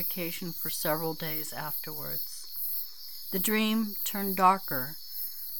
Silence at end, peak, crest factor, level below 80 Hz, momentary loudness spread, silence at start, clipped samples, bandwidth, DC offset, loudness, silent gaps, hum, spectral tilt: 0 s; -10 dBFS; 22 dB; -70 dBFS; 11 LU; 0 s; under 0.1%; 19.5 kHz; 0.7%; -30 LUFS; none; none; -3.5 dB/octave